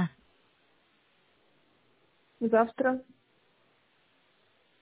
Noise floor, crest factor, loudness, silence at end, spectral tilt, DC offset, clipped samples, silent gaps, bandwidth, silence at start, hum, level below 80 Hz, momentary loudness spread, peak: -69 dBFS; 24 dB; -29 LUFS; 1.8 s; -6.5 dB/octave; under 0.1%; under 0.1%; none; 4 kHz; 0 s; none; -78 dBFS; 10 LU; -10 dBFS